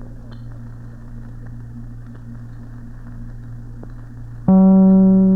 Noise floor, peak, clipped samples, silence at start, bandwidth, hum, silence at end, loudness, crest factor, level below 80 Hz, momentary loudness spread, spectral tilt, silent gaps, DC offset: -34 dBFS; -4 dBFS; under 0.1%; 0 s; 1.9 kHz; none; 0 s; -12 LUFS; 14 dB; -36 dBFS; 26 LU; -12.5 dB/octave; none; 0.7%